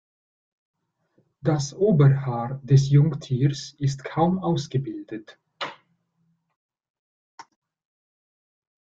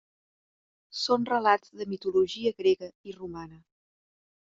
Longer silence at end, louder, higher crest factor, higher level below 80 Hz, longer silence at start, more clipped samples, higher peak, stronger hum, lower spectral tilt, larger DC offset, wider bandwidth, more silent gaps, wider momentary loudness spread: first, 1.5 s vs 1 s; first, -23 LUFS vs -27 LUFS; about the same, 18 dB vs 22 dB; first, -58 dBFS vs -68 dBFS; first, 1.45 s vs 0.95 s; neither; about the same, -6 dBFS vs -8 dBFS; neither; first, -7.5 dB/octave vs -2.5 dB/octave; neither; about the same, 7.6 kHz vs 7.6 kHz; first, 6.56-6.69 s, 6.90-7.38 s vs 2.95-3.04 s; about the same, 17 LU vs 17 LU